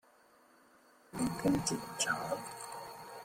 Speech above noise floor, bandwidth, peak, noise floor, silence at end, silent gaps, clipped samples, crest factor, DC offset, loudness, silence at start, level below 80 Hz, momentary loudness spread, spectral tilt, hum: 30 dB; 16.5 kHz; -18 dBFS; -65 dBFS; 0 s; none; under 0.1%; 20 dB; under 0.1%; -36 LUFS; 1.1 s; -64 dBFS; 14 LU; -3.5 dB/octave; none